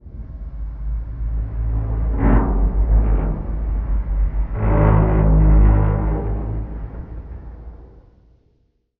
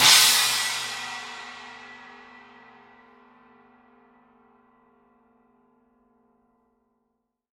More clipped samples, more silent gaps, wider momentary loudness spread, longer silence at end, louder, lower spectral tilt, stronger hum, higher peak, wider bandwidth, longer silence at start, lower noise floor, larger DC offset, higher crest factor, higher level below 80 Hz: neither; neither; second, 19 LU vs 30 LU; second, 1.15 s vs 5.55 s; about the same, -20 LUFS vs -20 LUFS; first, -10.5 dB/octave vs 2 dB/octave; neither; about the same, -2 dBFS vs -2 dBFS; second, 2.8 kHz vs 16.5 kHz; about the same, 0.05 s vs 0 s; second, -63 dBFS vs -77 dBFS; neither; second, 16 dB vs 26 dB; first, -20 dBFS vs -74 dBFS